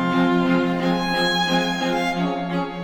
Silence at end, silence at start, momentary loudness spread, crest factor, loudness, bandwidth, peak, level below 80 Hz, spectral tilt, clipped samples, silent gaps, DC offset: 0 s; 0 s; 5 LU; 12 dB; -21 LUFS; 18.5 kHz; -8 dBFS; -48 dBFS; -5.5 dB/octave; under 0.1%; none; under 0.1%